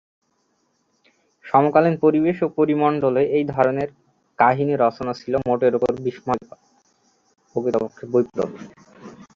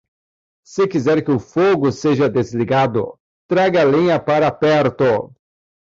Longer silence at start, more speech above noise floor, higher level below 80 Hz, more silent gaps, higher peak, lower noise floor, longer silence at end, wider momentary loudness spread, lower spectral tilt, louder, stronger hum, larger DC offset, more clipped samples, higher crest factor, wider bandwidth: first, 1.45 s vs 0.7 s; second, 48 dB vs over 74 dB; about the same, -58 dBFS vs -54 dBFS; second, none vs 3.20-3.49 s; about the same, -2 dBFS vs -4 dBFS; second, -68 dBFS vs under -90 dBFS; second, 0.15 s vs 0.6 s; first, 10 LU vs 7 LU; first, -8.5 dB/octave vs -7 dB/octave; second, -20 LUFS vs -16 LUFS; neither; neither; neither; first, 20 dB vs 12 dB; about the same, 7.4 kHz vs 7.8 kHz